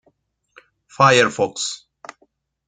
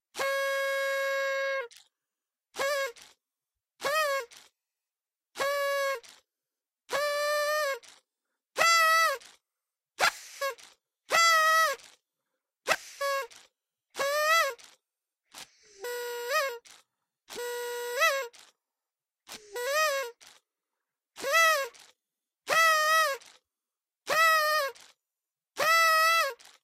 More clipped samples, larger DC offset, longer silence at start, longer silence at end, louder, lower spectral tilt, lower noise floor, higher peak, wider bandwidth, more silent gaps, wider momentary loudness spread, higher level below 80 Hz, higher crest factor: neither; neither; first, 1 s vs 0.15 s; first, 0.9 s vs 0.3 s; first, -17 LUFS vs -27 LUFS; first, -3.5 dB/octave vs 1.5 dB/octave; second, -64 dBFS vs under -90 dBFS; first, 0 dBFS vs -6 dBFS; second, 9.6 kHz vs 16 kHz; neither; second, 13 LU vs 21 LU; first, -64 dBFS vs -78 dBFS; about the same, 22 dB vs 24 dB